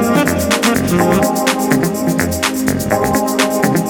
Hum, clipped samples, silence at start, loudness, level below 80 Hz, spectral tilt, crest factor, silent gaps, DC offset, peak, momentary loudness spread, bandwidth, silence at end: none; under 0.1%; 0 s; -14 LUFS; -36 dBFS; -4.5 dB/octave; 14 dB; none; under 0.1%; 0 dBFS; 3 LU; over 20 kHz; 0 s